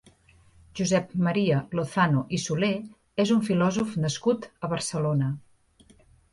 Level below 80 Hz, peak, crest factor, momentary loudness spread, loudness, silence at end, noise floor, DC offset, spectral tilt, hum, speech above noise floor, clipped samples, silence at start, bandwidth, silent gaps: -58 dBFS; -10 dBFS; 18 dB; 8 LU; -26 LUFS; 0.95 s; -58 dBFS; under 0.1%; -5.5 dB/octave; none; 33 dB; under 0.1%; 0.75 s; 11.5 kHz; none